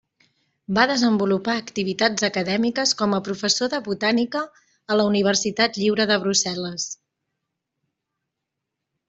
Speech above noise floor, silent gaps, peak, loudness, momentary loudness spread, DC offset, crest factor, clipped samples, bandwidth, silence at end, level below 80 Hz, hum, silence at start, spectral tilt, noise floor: 61 dB; none; -4 dBFS; -21 LUFS; 8 LU; under 0.1%; 20 dB; under 0.1%; 8.2 kHz; 2.15 s; -64 dBFS; none; 0.7 s; -3.5 dB/octave; -82 dBFS